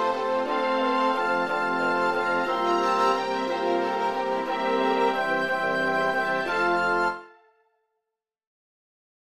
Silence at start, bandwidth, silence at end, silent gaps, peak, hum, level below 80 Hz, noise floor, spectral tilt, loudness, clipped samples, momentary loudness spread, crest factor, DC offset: 0 s; 13 kHz; 1.9 s; none; -12 dBFS; none; -66 dBFS; -85 dBFS; -4.5 dB/octave; -24 LUFS; under 0.1%; 3 LU; 14 dB; 0.2%